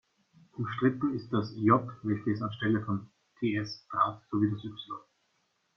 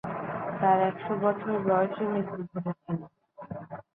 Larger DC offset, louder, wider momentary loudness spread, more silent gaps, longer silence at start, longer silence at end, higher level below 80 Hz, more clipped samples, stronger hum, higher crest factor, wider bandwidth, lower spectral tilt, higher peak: neither; about the same, -31 LUFS vs -29 LUFS; second, 13 LU vs 16 LU; neither; first, 0.55 s vs 0.05 s; first, 0.8 s vs 0.15 s; about the same, -68 dBFS vs -68 dBFS; neither; neither; about the same, 22 dB vs 20 dB; first, 6.4 kHz vs 4 kHz; second, -8 dB/octave vs -10.5 dB/octave; about the same, -10 dBFS vs -10 dBFS